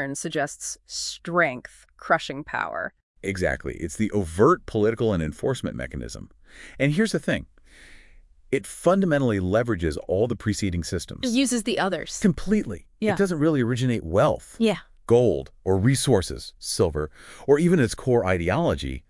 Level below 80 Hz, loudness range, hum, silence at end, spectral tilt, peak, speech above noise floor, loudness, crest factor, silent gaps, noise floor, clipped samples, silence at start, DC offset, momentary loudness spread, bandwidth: -44 dBFS; 5 LU; none; 0.1 s; -5.5 dB/octave; -6 dBFS; 27 dB; -24 LUFS; 18 dB; 3.03-3.15 s; -51 dBFS; under 0.1%; 0 s; under 0.1%; 12 LU; 12 kHz